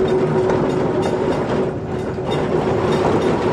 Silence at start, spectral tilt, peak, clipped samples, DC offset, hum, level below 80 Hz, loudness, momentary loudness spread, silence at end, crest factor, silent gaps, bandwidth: 0 s; -7 dB/octave; -6 dBFS; under 0.1%; under 0.1%; none; -40 dBFS; -19 LUFS; 5 LU; 0 s; 12 dB; none; 11 kHz